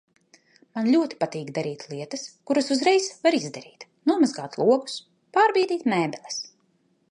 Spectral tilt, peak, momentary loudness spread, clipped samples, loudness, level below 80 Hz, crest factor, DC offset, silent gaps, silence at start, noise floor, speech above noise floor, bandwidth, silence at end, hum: -4.5 dB/octave; -6 dBFS; 15 LU; under 0.1%; -24 LUFS; -76 dBFS; 20 dB; under 0.1%; none; 0.75 s; -67 dBFS; 43 dB; 11 kHz; 0.65 s; none